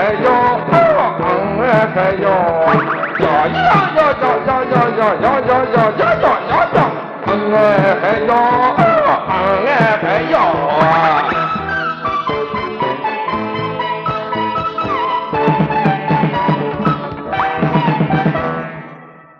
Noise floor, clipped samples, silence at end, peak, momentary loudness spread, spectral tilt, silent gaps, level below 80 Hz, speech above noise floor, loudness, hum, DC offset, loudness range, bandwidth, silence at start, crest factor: -37 dBFS; under 0.1%; 0.3 s; 0 dBFS; 7 LU; -8 dB/octave; none; -44 dBFS; 25 dB; -14 LUFS; none; under 0.1%; 5 LU; 7 kHz; 0 s; 14 dB